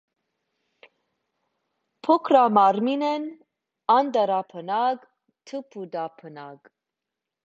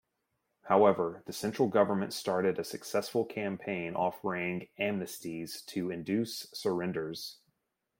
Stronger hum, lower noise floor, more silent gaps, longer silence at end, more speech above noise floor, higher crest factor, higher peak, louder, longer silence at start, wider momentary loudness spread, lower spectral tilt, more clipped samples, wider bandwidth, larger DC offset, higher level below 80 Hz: neither; first, -86 dBFS vs -81 dBFS; neither; first, 0.9 s vs 0.65 s; first, 63 dB vs 50 dB; about the same, 20 dB vs 22 dB; first, -4 dBFS vs -12 dBFS; first, -22 LUFS vs -32 LUFS; first, 2.05 s vs 0.65 s; first, 19 LU vs 12 LU; first, -6.5 dB/octave vs -5 dB/octave; neither; second, 7.6 kHz vs 16.5 kHz; neither; about the same, -78 dBFS vs -74 dBFS